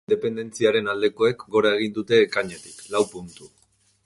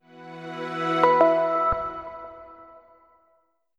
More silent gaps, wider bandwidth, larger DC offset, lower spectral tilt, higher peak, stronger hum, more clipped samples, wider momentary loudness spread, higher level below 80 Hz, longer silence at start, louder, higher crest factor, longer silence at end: neither; first, 11.5 kHz vs 8.6 kHz; neither; second, -4.5 dB/octave vs -6.5 dB/octave; about the same, -6 dBFS vs -4 dBFS; neither; neither; second, 12 LU vs 23 LU; second, -62 dBFS vs -52 dBFS; about the same, 0.1 s vs 0.15 s; about the same, -22 LUFS vs -22 LUFS; about the same, 18 dB vs 22 dB; second, 0.6 s vs 1.15 s